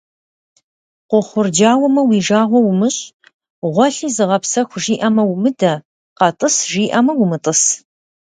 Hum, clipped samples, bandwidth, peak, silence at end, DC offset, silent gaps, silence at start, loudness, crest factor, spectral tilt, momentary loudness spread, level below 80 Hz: none; under 0.1%; 9.6 kHz; 0 dBFS; 0.6 s; under 0.1%; 3.13-3.20 s, 3.34-3.39 s, 3.50-3.62 s, 5.85-6.16 s; 1.1 s; -15 LUFS; 16 dB; -4 dB/octave; 6 LU; -62 dBFS